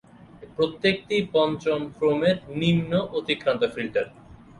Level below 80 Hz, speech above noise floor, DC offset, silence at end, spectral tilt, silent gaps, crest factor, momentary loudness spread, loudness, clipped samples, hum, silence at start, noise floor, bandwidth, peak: -56 dBFS; 23 dB; under 0.1%; 0.25 s; -6.5 dB/octave; none; 16 dB; 6 LU; -24 LUFS; under 0.1%; none; 0.35 s; -47 dBFS; 11 kHz; -8 dBFS